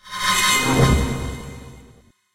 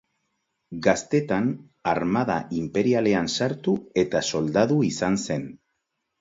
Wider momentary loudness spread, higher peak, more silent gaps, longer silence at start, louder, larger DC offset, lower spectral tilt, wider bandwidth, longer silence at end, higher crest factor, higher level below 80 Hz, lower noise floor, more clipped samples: first, 20 LU vs 7 LU; about the same, -2 dBFS vs -4 dBFS; neither; second, 0.05 s vs 0.7 s; first, -18 LUFS vs -24 LUFS; neither; second, -3.5 dB/octave vs -5.5 dB/octave; first, 16 kHz vs 8 kHz; second, 0.5 s vs 0.65 s; about the same, 18 dB vs 20 dB; first, -30 dBFS vs -56 dBFS; second, -51 dBFS vs -78 dBFS; neither